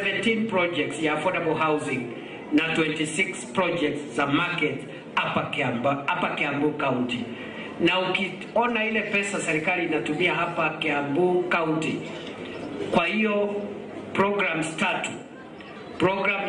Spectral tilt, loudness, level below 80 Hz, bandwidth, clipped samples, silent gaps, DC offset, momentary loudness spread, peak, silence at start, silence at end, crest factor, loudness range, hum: -4.5 dB/octave; -25 LUFS; -62 dBFS; 10 kHz; under 0.1%; none; under 0.1%; 12 LU; -10 dBFS; 0 s; 0 s; 16 dB; 2 LU; none